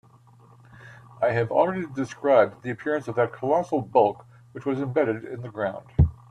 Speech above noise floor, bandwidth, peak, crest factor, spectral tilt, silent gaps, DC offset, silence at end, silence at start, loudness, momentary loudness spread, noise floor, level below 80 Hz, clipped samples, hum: 29 dB; 10.5 kHz; -6 dBFS; 20 dB; -8 dB/octave; none; under 0.1%; 0.15 s; 0.8 s; -25 LUFS; 11 LU; -53 dBFS; -42 dBFS; under 0.1%; none